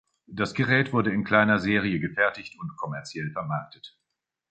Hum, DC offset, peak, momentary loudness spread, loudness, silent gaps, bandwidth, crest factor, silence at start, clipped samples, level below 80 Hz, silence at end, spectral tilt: none; under 0.1%; -6 dBFS; 15 LU; -25 LUFS; none; 8.8 kHz; 22 dB; 0.3 s; under 0.1%; -58 dBFS; 0.65 s; -6.5 dB/octave